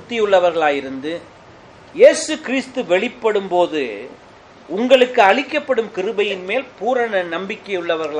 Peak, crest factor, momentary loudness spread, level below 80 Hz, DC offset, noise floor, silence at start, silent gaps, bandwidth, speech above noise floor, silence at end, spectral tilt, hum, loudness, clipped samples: 0 dBFS; 18 dB; 14 LU; -60 dBFS; under 0.1%; -43 dBFS; 0 s; none; 10.5 kHz; 26 dB; 0 s; -3.5 dB/octave; none; -17 LUFS; under 0.1%